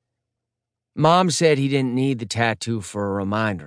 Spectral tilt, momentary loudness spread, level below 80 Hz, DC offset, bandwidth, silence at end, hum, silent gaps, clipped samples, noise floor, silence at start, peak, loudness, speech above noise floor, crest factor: -5 dB/octave; 10 LU; -62 dBFS; under 0.1%; 10.5 kHz; 0 s; none; none; under 0.1%; -84 dBFS; 0.95 s; -4 dBFS; -20 LUFS; 64 dB; 18 dB